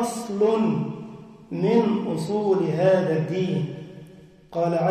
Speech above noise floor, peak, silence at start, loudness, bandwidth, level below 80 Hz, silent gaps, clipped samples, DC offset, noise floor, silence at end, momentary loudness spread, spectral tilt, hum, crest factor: 25 dB; -8 dBFS; 0 s; -23 LUFS; 15 kHz; -64 dBFS; none; under 0.1%; under 0.1%; -47 dBFS; 0 s; 17 LU; -7 dB/octave; none; 16 dB